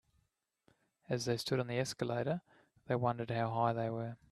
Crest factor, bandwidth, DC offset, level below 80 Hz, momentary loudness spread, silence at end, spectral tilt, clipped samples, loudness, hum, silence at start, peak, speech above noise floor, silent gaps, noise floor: 20 dB; 13.5 kHz; under 0.1%; -72 dBFS; 6 LU; 0.15 s; -5.5 dB/octave; under 0.1%; -37 LUFS; none; 1.1 s; -18 dBFS; 44 dB; none; -80 dBFS